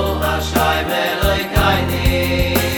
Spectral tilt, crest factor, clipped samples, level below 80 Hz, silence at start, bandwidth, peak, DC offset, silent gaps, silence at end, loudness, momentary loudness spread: -4.5 dB/octave; 16 dB; under 0.1%; -26 dBFS; 0 s; over 20 kHz; 0 dBFS; under 0.1%; none; 0 s; -17 LUFS; 3 LU